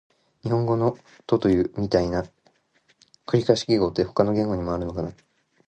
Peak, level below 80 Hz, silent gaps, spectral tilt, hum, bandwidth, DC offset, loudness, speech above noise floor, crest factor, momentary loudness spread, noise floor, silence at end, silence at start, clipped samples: -2 dBFS; -46 dBFS; none; -7 dB/octave; none; 9 kHz; under 0.1%; -24 LUFS; 42 dB; 22 dB; 13 LU; -65 dBFS; 0.55 s; 0.45 s; under 0.1%